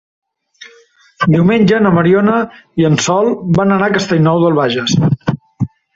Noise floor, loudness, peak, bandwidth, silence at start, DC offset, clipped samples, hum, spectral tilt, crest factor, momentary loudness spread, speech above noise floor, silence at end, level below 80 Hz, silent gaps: -47 dBFS; -13 LUFS; 0 dBFS; 7.8 kHz; 0.6 s; under 0.1%; under 0.1%; none; -6 dB/octave; 12 dB; 9 LU; 36 dB; 0.3 s; -46 dBFS; none